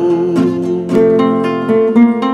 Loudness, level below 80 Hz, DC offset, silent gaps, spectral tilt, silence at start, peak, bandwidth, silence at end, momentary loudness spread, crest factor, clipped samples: -12 LUFS; -52 dBFS; under 0.1%; none; -8 dB/octave; 0 s; 0 dBFS; 9 kHz; 0 s; 5 LU; 12 dB; under 0.1%